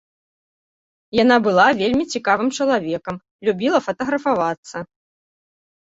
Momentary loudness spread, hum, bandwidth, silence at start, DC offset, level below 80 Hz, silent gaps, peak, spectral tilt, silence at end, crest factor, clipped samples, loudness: 15 LU; none; 7.8 kHz; 1.15 s; under 0.1%; -56 dBFS; 3.31-3.39 s, 4.58-4.63 s; -2 dBFS; -4.5 dB/octave; 1.1 s; 18 dB; under 0.1%; -19 LUFS